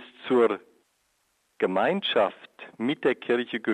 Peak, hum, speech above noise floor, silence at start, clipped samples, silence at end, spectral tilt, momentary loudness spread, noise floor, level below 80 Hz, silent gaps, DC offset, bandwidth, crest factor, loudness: -10 dBFS; none; 47 dB; 0 s; under 0.1%; 0 s; -6.5 dB/octave; 10 LU; -71 dBFS; -78 dBFS; none; under 0.1%; 9 kHz; 18 dB; -26 LUFS